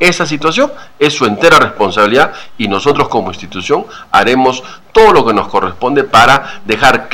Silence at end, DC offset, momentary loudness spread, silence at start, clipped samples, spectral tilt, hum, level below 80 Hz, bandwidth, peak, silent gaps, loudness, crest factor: 0 s; under 0.1%; 9 LU; 0 s; 0.3%; -4 dB/octave; none; -38 dBFS; 17 kHz; 0 dBFS; none; -10 LUFS; 10 dB